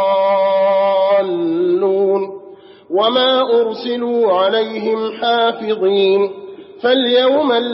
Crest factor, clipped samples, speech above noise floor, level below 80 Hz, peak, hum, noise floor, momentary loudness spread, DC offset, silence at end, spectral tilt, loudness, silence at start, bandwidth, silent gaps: 14 dB; under 0.1%; 25 dB; -72 dBFS; -2 dBFS; none; -39 dBFS; 8 LU; under 0.1%; 0 s; -2 dB/octave; -15 LUFS; 0 s; 5.8 kHz; none